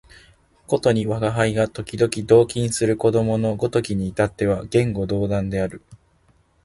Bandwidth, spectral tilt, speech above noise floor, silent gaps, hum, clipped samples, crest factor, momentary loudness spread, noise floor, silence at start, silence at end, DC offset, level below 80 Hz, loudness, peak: 11.5 kHz; -6 dB/octave; 39 dB; none; none; under 0.1%; 18 dB; 8 LU; -59 dBFS; 0.7 s; 0.7 s; under 0.1%; -46 dBFS; -21 LUFS; -2 dBFS